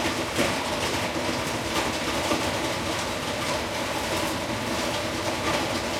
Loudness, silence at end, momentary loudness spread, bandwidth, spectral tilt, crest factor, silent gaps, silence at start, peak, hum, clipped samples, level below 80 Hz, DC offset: -26 LUFS; 0 s; 3 LU; 16.5 kHz; -3 dB/octave; 16 dB; none; 0 s; -10 dBFS; none; under 0.1%; -48 dBFS; under 0.1%